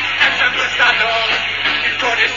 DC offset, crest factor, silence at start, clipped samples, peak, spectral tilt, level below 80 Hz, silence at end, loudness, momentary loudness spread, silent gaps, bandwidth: 0.5%; 14 dB; 0 s; under 0.1%; -2 dBFS; -1.5 dB/octave; -52 dBFS; 0 s; -14 LUFS; 3 LU; none; 7.4 kHz